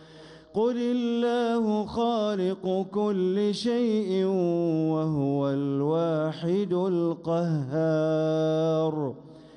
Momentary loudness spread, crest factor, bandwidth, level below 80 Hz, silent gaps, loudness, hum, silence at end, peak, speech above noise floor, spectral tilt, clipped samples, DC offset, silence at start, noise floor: 3 LU; 10 dB; 10.5 kHz; -64 dBFS; none; -26 LUFS; none; 0.1 s; -16 dBFS; 23 dB; -8 dB/octave; under 0.1%; under 0.1%; 0 s; -49 dBFS